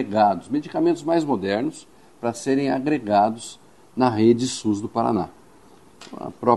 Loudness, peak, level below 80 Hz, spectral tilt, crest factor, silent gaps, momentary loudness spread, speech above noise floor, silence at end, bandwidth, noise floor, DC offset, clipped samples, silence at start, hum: -22 LUFS; -2 dBFS; -62 dBFS; -6 dB/octave; 20 dB; none; 17 LU; 30 dB; 0 s; 12 kHz; -51 dBFS; 0.2%; under 0.1%; 0 s; none